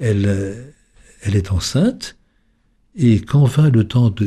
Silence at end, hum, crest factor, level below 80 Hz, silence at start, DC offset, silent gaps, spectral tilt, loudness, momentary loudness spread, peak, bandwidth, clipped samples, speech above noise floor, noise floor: 0 s; none; 12 dB; -40 dBFS; 0 s; under 0.1%; none; -7 dB/octave; -17 LUFS; 15 LU; -4 dBFS; 13 kHz; under 0.1%; 44 dB; -60 dBFS